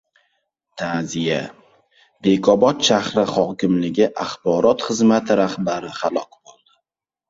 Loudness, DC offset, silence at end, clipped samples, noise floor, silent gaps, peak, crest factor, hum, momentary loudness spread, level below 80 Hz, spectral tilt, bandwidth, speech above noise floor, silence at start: -19 LUFS; under 0.1%; 1.05 s; under 0.1%; -81 dBFS; none; -2 dBFS; 18 dB; none; 10 LU; -58 dBFS; -5 dB/octave; 7.8 kHz; 62 dB; 0.75 s